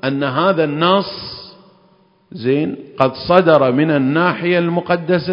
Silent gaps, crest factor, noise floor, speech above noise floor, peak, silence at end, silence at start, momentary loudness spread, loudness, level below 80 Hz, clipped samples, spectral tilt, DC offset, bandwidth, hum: none; 16 dB; -53 dBFS; 38 dB; 0 dBFS; 0 s; 0.05 s; 11 LU; -15 LUFS; -54 dBFS; under 0.1%; -9 dB/octave; under 0.1%; 5.4 kHz; none